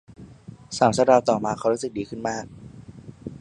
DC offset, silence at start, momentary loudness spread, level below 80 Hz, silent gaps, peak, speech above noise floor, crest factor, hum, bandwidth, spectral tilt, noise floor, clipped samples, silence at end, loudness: under 0.1%; 0.2 s; 25 LU; -56 dBFS; none; -2 dBFS; 22 dB; 22 dB; none; 11 kHz; -5 dB/octave; -44 dBFS; under 0.1%; 0.05 s; -22 LUFS